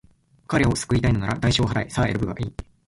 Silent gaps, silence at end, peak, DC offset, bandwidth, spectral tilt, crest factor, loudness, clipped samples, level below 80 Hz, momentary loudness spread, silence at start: none; 0.25 s; -6 dBFS; under 0.1%; 11.5 kHz; -5.5 dB/octave; 16 dB; -23 LUFS; under 0.1%; -38 dBFS; 7 LU; 0.5 s